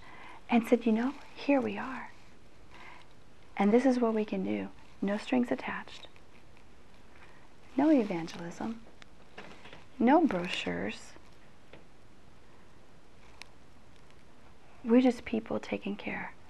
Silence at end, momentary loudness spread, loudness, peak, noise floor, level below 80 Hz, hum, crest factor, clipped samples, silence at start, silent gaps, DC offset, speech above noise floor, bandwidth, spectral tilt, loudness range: 0.2 s; 25 LU; -30 LUFS; -12 dBFS; -59 dBFS; -64 dBFS; none; 20 dB; under 0.1%; 0 s; none; 0.4%; 29 dB; 12 kHz; -6.5 dB/octave; 5 LU